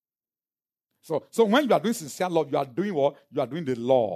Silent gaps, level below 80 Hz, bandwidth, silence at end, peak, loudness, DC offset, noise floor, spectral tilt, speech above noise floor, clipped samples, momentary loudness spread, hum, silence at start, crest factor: none; -76 dBFS; 13.5 kHz; 0 s; -6 dBFS; -25 LUFS; under 0.1%; under -90 dBFS; -5.5 dB/octave; over 65 dB; under 0.1%; 9 LU; none; 1.05 s; 18 dB